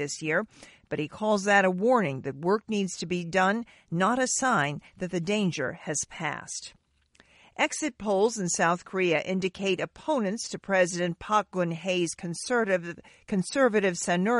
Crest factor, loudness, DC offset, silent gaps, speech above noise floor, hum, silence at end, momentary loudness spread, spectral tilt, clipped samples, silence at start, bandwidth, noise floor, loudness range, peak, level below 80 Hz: 20 dB; -27 LUFS; under 0.1%; none; 36 dB; none; 0 s; 10 LU; -4 dB/octave; under 0.1%; 0 s; 11.5 kHz; -63 dBFS; 4 LU; -8 dBFS; -64 dBFS